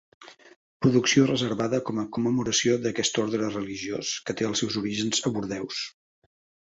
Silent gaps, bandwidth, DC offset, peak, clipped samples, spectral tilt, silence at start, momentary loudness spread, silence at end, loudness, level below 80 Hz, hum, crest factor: 0.56-0.80 s; 8.2 kHz; under 0.1%; -6 dBFS; under 0.1%; -4 dB/octave; 0.2 s; 10 LU; 0.75 s; -26 LUFS; -60 dBFS; none; 20 dB